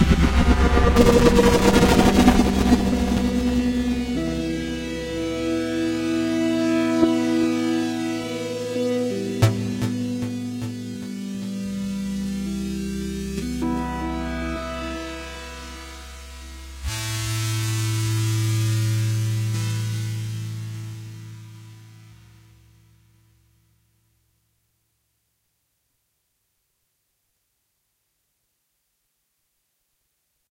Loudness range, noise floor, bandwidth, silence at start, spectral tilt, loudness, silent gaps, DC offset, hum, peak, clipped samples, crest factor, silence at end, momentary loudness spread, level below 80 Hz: 13 LU; -73 dBFS; 16 kHz; 0 s; -6 dB/octave; -22 LUFS; none; under 0.1%; none; 0 dBFS; under 0.1%; 22 dB; 8.6 s; 18 LU; -32 dBFS